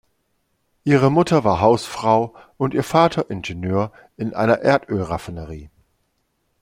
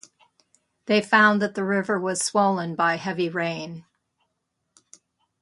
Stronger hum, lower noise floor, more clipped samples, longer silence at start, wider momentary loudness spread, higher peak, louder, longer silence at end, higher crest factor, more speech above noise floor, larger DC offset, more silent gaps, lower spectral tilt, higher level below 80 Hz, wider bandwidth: neither; second, -69 dBFS vs -77 dBFS; neither; about the same, 0.85 s vs 0.85 s; about the same, 14 LU vs 16 LU; about the same, -2 dBFS vs -4 dBFS; first, -19 LUFS vs -22 LUFS; second, 0.95 s vs 1.6 s; about the same, 18 dB vs 22 dB; second, 50 dB vs 55 dB; neither; neither; first, -6.5 dB/octave vs -4 dB/octave; first, -50 dBFS vs -72 dBFS; first, 16 kHz vs 11.5 kHz